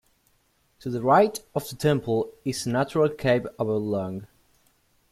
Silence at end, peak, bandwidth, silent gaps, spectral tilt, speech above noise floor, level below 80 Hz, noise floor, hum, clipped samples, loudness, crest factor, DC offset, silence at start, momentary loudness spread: 0.85 s; -6 dBFS; 15.5 kHz; none; -6 dB/octave; 42 dB; -58 dBFS; -67 dBFS; none; under 0.1%; -25 LUFS; 20 dB; under 0.1%; 0.85 s; 13 LU